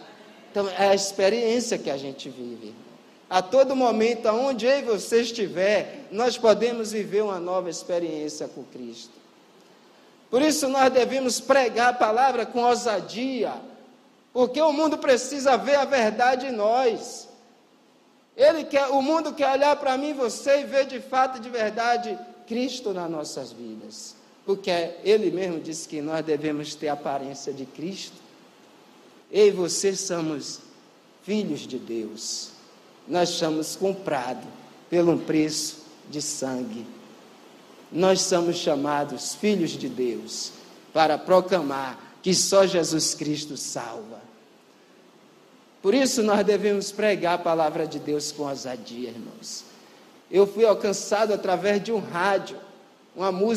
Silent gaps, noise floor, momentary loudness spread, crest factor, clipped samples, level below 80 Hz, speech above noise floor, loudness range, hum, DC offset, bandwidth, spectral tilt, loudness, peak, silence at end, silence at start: none; -58 dBFS; 16 LU; 20 dB; under 0.1%; -74 dBFS; 34 dB; 6 LU; none; under 0.1%; 15 kHz; -3.5 dB/octave; -24 LUFS; -4 dBFS; 0 s; 0 s